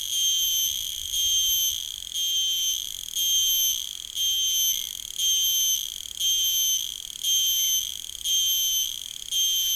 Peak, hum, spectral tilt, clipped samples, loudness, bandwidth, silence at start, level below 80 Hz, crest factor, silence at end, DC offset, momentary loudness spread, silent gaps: -14 dBFS; none; 4 dB/octave; under 0.1%; -22 LUFS; over 20 kHz; 0 s; -56 dBFS; 12 dB; 0 s; under 0.1%; 9 LU; none